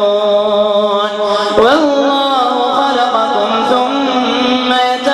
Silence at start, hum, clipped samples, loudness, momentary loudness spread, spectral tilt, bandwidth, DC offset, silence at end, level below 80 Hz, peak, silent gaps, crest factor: 0 s; none; under 0.1%; -12 LUFS; 3 LU; -4 dB/octave; 12 kHz; under 0.1%; 0 s; -52 dBFS; 0 dBFS; none; 12 dB